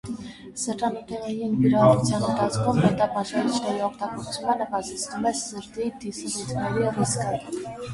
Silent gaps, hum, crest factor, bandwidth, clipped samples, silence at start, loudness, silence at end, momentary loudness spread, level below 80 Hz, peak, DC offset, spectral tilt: none; none; 20 dB; 11.5 kHz; under 0.1%; 0.05 s; -25 LUFS; 0 s; 12 LU; -54 dBFS; -6 dBFS; under 0.1%; -5.5 dB/octave